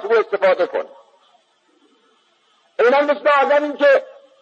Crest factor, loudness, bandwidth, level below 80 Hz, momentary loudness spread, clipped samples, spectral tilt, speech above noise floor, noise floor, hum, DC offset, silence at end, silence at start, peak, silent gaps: 14 dB; -16 LUFS; 7.4 kHz; -82 dBFS; 10 LU; under 0.1%; -4 dB/octave; 44 dB; -59 dBFS; none; under 0.1%; 0.3 s; 0 s; -4 dBFS; none